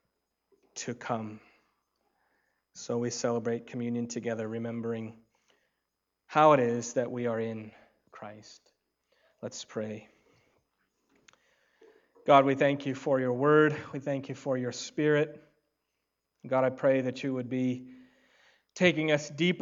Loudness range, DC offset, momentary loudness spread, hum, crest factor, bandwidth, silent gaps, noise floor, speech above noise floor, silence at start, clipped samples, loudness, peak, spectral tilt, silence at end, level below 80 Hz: 17 LU; under 0.1%; 19 LU; none; 24 dB; 7.8 kHz; none; -84 dBFS; 55 dB; 0.75 s; under 0.1%; -29 LUFS; -6 dBFS; -5.5 dB/octave; 0 s; -78 dBFS